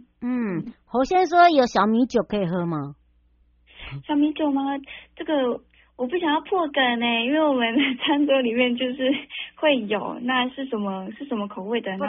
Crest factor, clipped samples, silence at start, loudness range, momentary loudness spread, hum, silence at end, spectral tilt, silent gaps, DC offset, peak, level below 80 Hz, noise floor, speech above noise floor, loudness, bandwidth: 18 dB; under 0.1%; 0.2 s; 5 LU; 12 LU; none; 0 s; -3 dB/octave; none; under 0.1%; -4 dBFS; -56 dBFS; -60 dBFS; 38 dB; -22 LUFS; 6 kHz